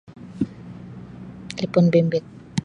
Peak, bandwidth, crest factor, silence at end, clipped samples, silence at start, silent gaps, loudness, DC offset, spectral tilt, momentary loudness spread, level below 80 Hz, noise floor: -4 dBFS; 10.5 kHz; 20 dB; 0 s; under 0.1%; 0.2 s; none; -22 LUFS; under 0.1%; -7.5 dB/octave; 22 LU; -54 dBFS; -39 dBFS